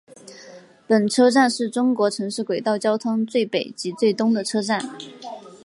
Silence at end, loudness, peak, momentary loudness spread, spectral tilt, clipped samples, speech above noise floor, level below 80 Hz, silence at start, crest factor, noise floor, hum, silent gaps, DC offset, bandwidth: 0.1 s; -21 LUFS; -4 dBFS; 19 LU; -4.5 dB/octave; under 0.1%; 24 dB; -74 dBFS; 0.25 s; 16 dB; -45 dBFS; none; none; under 0.1%; 11.5 kHz